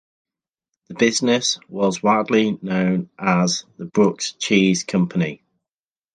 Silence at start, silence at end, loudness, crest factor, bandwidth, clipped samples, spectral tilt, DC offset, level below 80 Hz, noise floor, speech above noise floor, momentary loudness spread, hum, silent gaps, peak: 0.9 s; 0.8 s; -20 LUFS; 18 dB; 9.6 kHz; under 0.1%; -4.5 dB/octave; under 0.1%; -60 dBFS; under -90 dBFS; over 71 dB; 8 LU; none; none; -2 dBFS